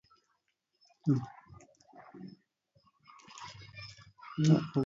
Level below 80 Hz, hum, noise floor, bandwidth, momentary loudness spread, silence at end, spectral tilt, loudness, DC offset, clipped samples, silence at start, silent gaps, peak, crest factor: -70 dBFS; none; -80 dBFS; 7.6 kHz; 25 LU; 0 s; -7.5 dB/octave; -31 LUFS; under 0.1%; under 0.1%; 1.05 s; none; -14 dBFS; 22 dB